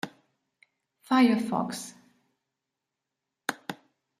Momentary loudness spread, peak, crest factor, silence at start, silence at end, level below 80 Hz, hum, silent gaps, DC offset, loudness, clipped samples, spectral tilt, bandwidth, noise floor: 20 LU; -10 dBFS; 22 dB; 0.05 s; 0.45 s; -78 dBFS; none; none; under 0.1%; -27 LUFS; under 0.1%; -4.5 dB/octave; 15 kHz; -86 dBFS